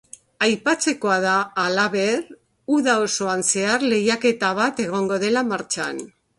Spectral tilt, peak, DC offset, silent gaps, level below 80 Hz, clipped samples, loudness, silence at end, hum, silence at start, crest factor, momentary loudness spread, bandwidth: -3 dB/octave; -4 dBFS; under 0.1%; none; -66 dBFS; under 0.1%; -21 LUFS; 0.35 s; none; 0.4 s; 18 dB; 6 LU; 11.5 kHz